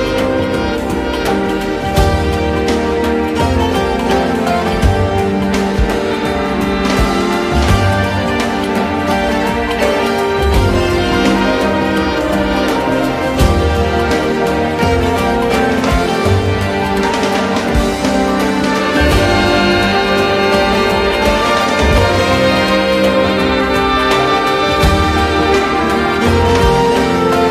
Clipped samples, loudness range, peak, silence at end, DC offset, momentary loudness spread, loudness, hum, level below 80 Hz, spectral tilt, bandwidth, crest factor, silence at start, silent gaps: under 0.1%; 3 LU; 0 dBFS; 0 s; under 0.1%; 4 LU; -13 LUFS; none; -24 dBFS; -5.5 dB/octave; 15.5 kHz; 12 dB; 0 s; none